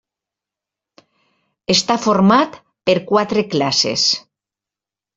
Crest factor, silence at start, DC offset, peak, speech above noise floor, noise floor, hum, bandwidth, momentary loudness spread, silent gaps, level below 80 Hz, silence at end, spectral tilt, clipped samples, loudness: 18 dB; 1.7 s; under 0.1%; -2 dBFS; 72 dB; -88 dBFS; none; 7.8 kHz; 10 LU; none; -58 dBFS; 0.95 s; -4 dB/octave; under 0.1%; -16 LUFS